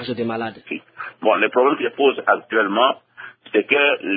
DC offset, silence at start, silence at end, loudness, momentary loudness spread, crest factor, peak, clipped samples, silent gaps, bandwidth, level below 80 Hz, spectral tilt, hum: under 0.1%; 0 s; 0 s; -19 LUFS; 15 LU; 18 dB; -2 dBFS; under 0.1%; none; 4.9 kHz; -70 dBFS; -9 dB/octave; none